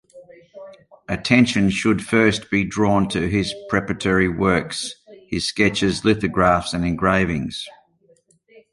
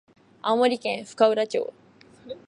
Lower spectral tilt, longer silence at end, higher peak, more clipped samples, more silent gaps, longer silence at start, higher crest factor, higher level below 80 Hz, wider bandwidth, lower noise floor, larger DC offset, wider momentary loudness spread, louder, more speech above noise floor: first, -5.5 dB/octave vs -4 dB/octave; first, 1 s vs 0.1 s; about the same, -2 dBFS vs -4 dBFS; neither; neither; second, 0.15 s vs 0.45 s; about the same, 18 dB vs 20 dB; first, -42 dBFS vs -74 dBFS; about the same, 11.5 kHz vs 11 kHz; first, -58 dBFS vs -50 dBFS; neither; about the same, 10 LU vs 12 LU; first, -19 LUFS vs -24 LUFS; first, 39 dB vs 27 dB